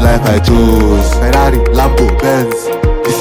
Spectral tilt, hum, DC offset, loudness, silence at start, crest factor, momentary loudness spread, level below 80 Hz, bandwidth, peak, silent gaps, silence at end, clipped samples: -6 dB/octave; none; under 0.1%; -11 LUFS; 0 s; 8 dB; 5 LU; -12 dBFS; 17 kHz; 0 dBFS; none; 0 s; under 0.1%